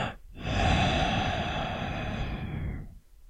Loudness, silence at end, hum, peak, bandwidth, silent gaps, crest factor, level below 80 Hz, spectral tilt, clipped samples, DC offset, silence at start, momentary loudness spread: -30 LUFS; 0.05 s; none; -12 dBFS; 10 kHz; none; 18 dB; -38 dBFS; -5.5 dB/octave; under 0.1%; under 0.1%; 0 s; 13 LU